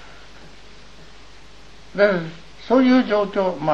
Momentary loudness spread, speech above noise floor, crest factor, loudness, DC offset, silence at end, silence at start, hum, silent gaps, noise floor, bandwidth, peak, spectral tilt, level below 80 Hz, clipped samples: 19 LU; 28 dB; 18 dB; -18 LUFS; 0.9%; 0 s; 1.95 s; none; none; -46 dBFS; 7.4 kHz; -4 dBFS; -7 dB/octave; -52 dBFS; under 0.1%